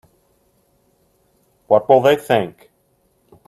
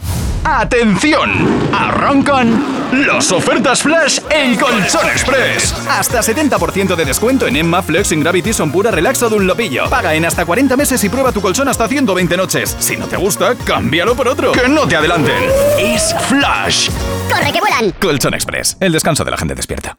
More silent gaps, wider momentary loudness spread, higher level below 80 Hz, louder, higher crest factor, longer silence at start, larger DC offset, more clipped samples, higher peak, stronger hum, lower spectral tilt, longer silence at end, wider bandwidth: neither; about the same, 6 LU vs 4 LU; second, -62 dBFS vs -30 dBFS; second, -15 LUFS vs -12 LUFS; first, 20 dB vs 10 dB; first, 1.7 s vs 0 s; second, under 0.1% vs 0.1%; neither; about the same, 0 dBFS vs -2 dBFS; neither; first, -6 dB/octave vs -3.5 dB/octave; first, 0.95 s vs 0.05 s; second, 13.5 kHz vs over 20 kHz